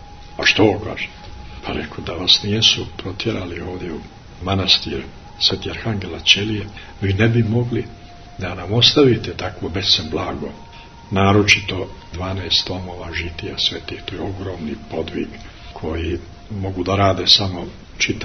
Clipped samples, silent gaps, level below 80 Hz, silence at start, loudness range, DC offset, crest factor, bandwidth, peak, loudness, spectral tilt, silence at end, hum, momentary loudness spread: under 0.1%; none; -40 dBFS; 0 s; 7 LU; under 0.1%; 20 dB; 10 kHz; 0 dBFS; -18 LUFS; -4 dB/octave; 0 s; none; 17 LU